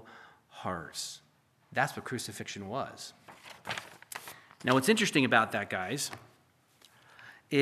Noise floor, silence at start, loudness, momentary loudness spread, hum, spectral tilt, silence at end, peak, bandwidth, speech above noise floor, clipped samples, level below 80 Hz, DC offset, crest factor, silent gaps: -67 dBFS; 0.05 s; -31 LUFS; 24 LU; none; -4 dB/octave; 0 s; -8 dBFS; 15 kHz; 36 dB; under 0.1%; -74 dBFS; under 0.1%; 26 dB; none